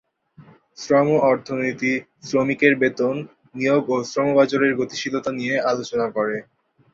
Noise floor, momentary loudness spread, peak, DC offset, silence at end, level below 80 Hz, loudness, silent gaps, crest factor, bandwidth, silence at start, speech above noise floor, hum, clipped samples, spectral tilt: -50 dBFS; 8 LU; -2 dBFS; under 0.1%; 0.5 s; -64 dBFS; -21 LUFS; none; 18 dB; 7.6 kHz; 0.4 s; 29 dB; none; under 0.1%; -5.5 dB/octave